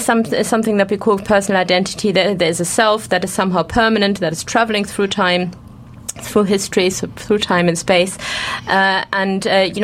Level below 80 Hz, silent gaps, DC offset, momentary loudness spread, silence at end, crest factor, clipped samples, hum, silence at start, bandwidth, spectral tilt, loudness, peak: -44 dBFS; none; under 0.1%; 5 LU; 0 s; 16 dB; under 0.1%; none; 0 s; 16 kHz; -4 dB/octave; -16 LUFS; 0 dBFS